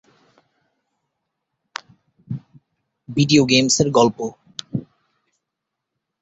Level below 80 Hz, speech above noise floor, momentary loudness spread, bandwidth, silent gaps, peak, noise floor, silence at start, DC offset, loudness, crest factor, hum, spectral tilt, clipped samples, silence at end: -56 dBFS; 65 dB; 21 LU; 8.2 kHz; none; -2 dBFS; -81 dBFS; 2.3 s; under 0.1%; -18 LUFS; 22 dB; none; -4 dB/octave; under 0.1%; 1.4 s